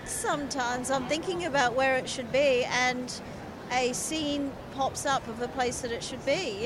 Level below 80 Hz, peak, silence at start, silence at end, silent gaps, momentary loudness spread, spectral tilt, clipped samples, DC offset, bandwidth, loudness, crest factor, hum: -54 dBFS; -12 dBFS; 0 s; 0 s; none; 10 LU; -3 dB/octave; under 0.1%; under 0.1%; 16 kHz; -29 LUFS; 18 dB; none